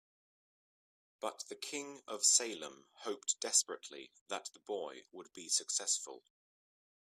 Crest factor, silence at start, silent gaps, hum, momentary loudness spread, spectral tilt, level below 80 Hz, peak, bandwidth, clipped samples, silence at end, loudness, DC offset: 26 dB; 1.2 s; 4.21-4.26 s; none; 20 LU; 1 dB/octave; under -90 dBFS; -14 dBFS; 15.5 kHz; under 0.1%; 0.95 s; -35 LUFS; under 0.1%